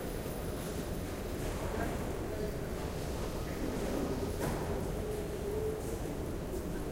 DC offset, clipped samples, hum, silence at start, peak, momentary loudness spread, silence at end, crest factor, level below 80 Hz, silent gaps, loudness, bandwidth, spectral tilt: under 0.1%; under 0.1%; none; 0 s; -22 dBFS; 3 LU; 0 s; 14 dB; -44 dBFS; none; -38 LUFS; 16.5 kHz; -6 dB/octave